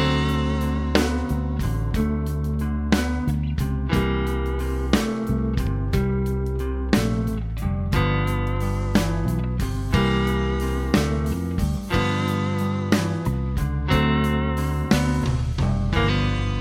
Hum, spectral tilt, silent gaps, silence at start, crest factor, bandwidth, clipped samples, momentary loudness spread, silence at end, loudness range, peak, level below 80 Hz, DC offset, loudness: none; -6.5 dB/octave; none; 0 s; 20 dB; 16.5 kHz; under 0.1%; 4 LU; 0 s; 2 LU; -2 dBFS; -28 dBFS; under 0.1%; -23 LUFS